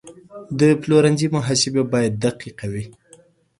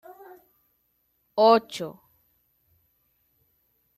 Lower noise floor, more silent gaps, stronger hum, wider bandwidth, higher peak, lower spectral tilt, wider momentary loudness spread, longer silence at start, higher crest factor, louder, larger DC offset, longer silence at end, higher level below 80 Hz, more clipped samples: second, -52 dBFS vs -72 dBFS; neither; neither; second, 11.5 kHz vs 13 kHz; about the same, -4 dBFS vs -6 dBFS; about the same, -5 dB/octave vs -4.5 dB/octave; second, 15 LU vs 20 LU; second, 0.05 s vs 1.35 s; about the same, 18 dB vs 22 dB; first, -19 LUFS vs -23 LUFS; neither; second, 0.7 s vs 2.05 s; first, -54 dBFS vs -78 dBFS; neither